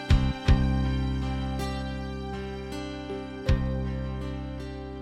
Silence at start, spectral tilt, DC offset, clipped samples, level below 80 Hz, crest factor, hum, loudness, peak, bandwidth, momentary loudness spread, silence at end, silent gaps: 0 s; -7 dB/octave; under 0.1%; under 0.1%; -30 dBFS; 18 dB; none; -30 LUFS; -8 dBFS; 11.5 kHz; 11 LU; 0 s; none